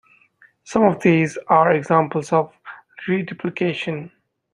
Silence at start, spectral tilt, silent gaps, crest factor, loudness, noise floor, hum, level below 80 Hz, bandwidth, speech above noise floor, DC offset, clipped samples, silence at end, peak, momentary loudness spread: 0.65 s; -7 dB/octave; none; 18 dB; -19 LUFS; -55 dBFS; none; -62 dBFS; 11 kHz; 37 dB; under 0.1%; under 0.1%; 0.45 s; -2 dBFS; 16 LU